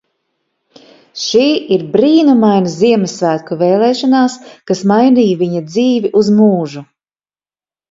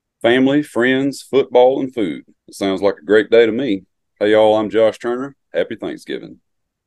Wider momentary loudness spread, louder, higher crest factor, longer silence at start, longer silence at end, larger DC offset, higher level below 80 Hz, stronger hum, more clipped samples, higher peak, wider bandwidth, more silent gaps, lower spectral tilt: second, 9 LU vs 13 LU; first, -12 LUFS vs -16 LUFS; about the same, 12 dB vs 16 dB; first, 1.15 s vs 0.25 s; first, 1.1 s vs 0.55 s; neither; about the same, -58 dBFS vs -58 dBFS; neither; neither; about the same, 0 dBFS vs 0 dBFS; second, 7.8 kHz vs 12.5 kHz; neither; about the same, -6 dB/octave vs -5.5 dB/octave